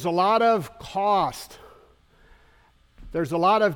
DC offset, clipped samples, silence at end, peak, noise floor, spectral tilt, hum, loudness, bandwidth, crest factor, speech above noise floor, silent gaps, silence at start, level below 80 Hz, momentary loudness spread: under 0.1%; under 0.1%; 0 s; -8 dBFS; -58 dBFS; -5.5 dB/octave; none; -23 LUFS; 18.5 kHz; 16 dB; 36 dB; none; 0 s; -52 dBFS; 13 LU